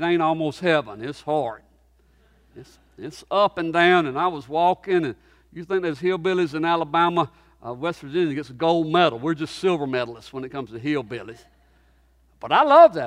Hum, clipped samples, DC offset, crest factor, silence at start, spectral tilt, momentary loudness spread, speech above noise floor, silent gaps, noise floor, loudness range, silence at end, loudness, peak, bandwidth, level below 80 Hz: none; under 0.1%; under 0.1%; 20 dB; 0 s; -6 dB/octave; 17 LU; 37 dB; none; -59 dBFS; 5 LU; 0 s; -22 LUFS; -2 dBFS; 11 kHz; -60 dBFS